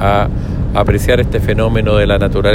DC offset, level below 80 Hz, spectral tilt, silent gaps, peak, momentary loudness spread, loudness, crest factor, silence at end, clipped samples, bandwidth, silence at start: under 0.1%; -20 dBFS; -7 dB/octave; none; 0 dBFS; 5 LU; -13 LUFS; 12 dB; 0 s; under 0.1%; 16 kHz; 0 s